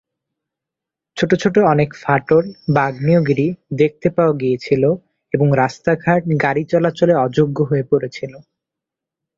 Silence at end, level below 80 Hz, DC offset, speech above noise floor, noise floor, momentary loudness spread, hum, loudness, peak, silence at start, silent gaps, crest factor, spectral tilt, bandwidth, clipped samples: 1 s; -52 dBFS; under 0.1%; 69 dB; -85 dBFS; 6 LU; none; -17 LUFS; -2 dBFS; 1.15 s; none; 16 dB; -8 dB/octave; 7.6 kHz; under 0.1%